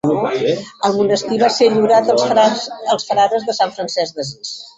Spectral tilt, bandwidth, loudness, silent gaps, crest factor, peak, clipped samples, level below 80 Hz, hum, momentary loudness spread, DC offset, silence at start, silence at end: -4 dB/octave; 8.2 kHz; -16 LUFS; none; 14 dB; -2 dBFS; under 0.1%; -58 dBFS; none; 9 LU; under 0.1%; 0.05 s; 0.1 s